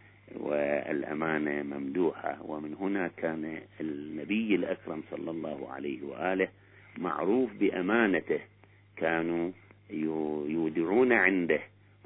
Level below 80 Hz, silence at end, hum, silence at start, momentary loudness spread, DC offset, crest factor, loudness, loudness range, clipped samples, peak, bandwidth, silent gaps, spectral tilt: -74 dBFS; 0.4 s; 50 Hz at -60 dBFS; 0.3 s; 12 LU; under 0.1%; 22 dB; -31 LUFS; 5 LU; under 0.1%; -8 dBFS; 4 kHz; none; -10 dB/octave